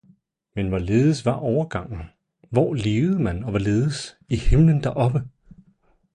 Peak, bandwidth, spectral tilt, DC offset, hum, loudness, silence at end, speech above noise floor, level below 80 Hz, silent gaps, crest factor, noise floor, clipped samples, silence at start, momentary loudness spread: -6 dBFS; 10.5 kHz; -7.5 dB/octave; under 0.1%; none; -22 LUFS; 0.85 s; 41 dB; -34 dBFS; none; 16 dB; -61 dBFS; under 0.1%; 0.55 s; 14 LU